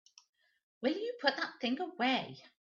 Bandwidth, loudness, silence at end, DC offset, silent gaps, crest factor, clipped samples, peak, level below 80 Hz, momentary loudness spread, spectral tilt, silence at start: 7.4 kHz; -35 LUFS; 0.15 s; under 0.1%; none; 24 dB; under 0.1%; -14 dBFS; -84 dBFS; 4 LU; -1 dB/octave; 0.8 s